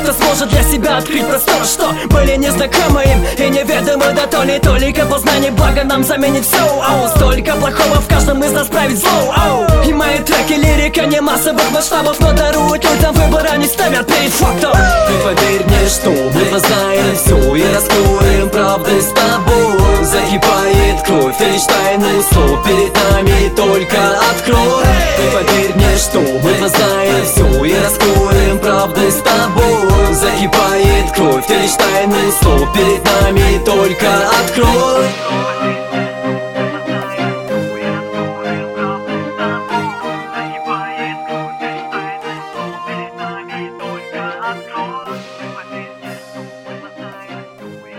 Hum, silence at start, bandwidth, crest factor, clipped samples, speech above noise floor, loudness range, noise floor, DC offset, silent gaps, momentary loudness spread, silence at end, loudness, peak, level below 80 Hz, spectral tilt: none; 0 s; 19 kHz; 12 dB; under 0.1%; 22 dB; 11 LU; -33 dBFS; under 0.1%; none; 13 LU; 0 s; -12 LUFS; 0 dBFS; -20 dBFS; -4.5 dB/octave